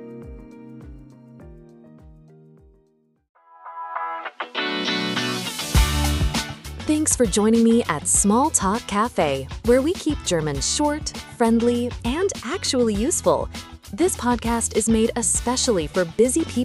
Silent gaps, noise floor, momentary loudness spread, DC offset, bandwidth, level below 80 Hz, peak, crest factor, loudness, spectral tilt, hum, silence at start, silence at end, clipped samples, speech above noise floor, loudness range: 3.29-3.35 s; -63 dBFS; 14 LU; under 0.1%; 15.5 kHz; -34 dBFS; -4 dBFS; 20 dB; -21 LUFS; -4 dB/octave; none; 0 s; 0 s; under 0.1%; 42 dB; 9 LU